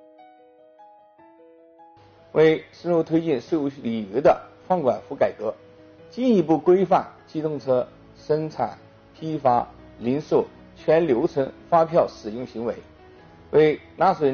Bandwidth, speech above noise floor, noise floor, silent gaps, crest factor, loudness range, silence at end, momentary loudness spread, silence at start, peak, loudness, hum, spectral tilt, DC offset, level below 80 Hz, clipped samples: 6.8 kHz; 31 dB; -52 dBFS; none; 18 dB; 3 LU; 0 s; 13 LU; 2.35 s; -6 dBFS; -23 LUFS; none; -6 dB/octave; under 0.1%; -58 dBFS; under 0.1%